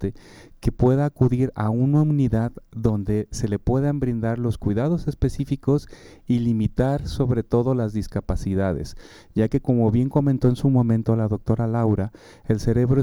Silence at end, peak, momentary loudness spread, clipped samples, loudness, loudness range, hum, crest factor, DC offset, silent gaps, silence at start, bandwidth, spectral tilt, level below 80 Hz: 0 s; -6 dBFS; 7 LU; under 0.1%; -22 LUFS; 3 LU; none; 16 dB; under 0.1%; none; 0 s; 12 kHz; -9 dB/octave; -38 dBFS